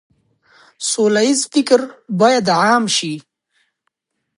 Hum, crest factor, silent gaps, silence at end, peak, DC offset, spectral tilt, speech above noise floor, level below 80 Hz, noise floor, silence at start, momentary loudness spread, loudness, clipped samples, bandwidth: none; 16 dB; none; 1.2 s; 0 dBFS; under 0.1%; -3.5 dB/octave; 57 dB; -68 dBFS; -72 dBFS; 0.8 s; 11 LU; -15 LUFS; under 0.1%; 11.5 kHz